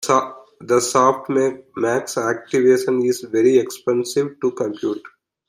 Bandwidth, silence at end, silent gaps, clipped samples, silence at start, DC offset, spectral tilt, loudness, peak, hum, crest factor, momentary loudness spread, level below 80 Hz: 15.5 kHz; 0.4 s; none; under 0.1%; 0 s; under 0.1%; -4.5 dB/octave; -19 LUFS; -2 dBFS; none; 16 dB; 8 LU; -66 dBFS